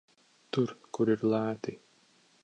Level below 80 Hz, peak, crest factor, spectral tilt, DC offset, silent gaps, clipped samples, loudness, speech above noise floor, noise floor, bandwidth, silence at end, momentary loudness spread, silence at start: -74 dBFS; -14 dBFS; 18 dB; -7 dB/octave; under 0.1%; none; under 0.1%; -31 LUFS; 36 dB; -65 dBFS; 9 kHz; 0.7 s; 10 LU; 0.55 s